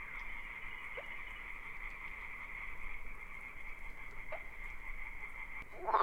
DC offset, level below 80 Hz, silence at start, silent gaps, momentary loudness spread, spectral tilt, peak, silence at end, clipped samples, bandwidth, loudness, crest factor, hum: under 0.1%; -50 dBFS; 0 s; none; 4 LU; -4.5 dB/octave; -18 dBFS; 0 s; under 0.1%; 16.5 kHz; -46 LUFS; 24 dB; none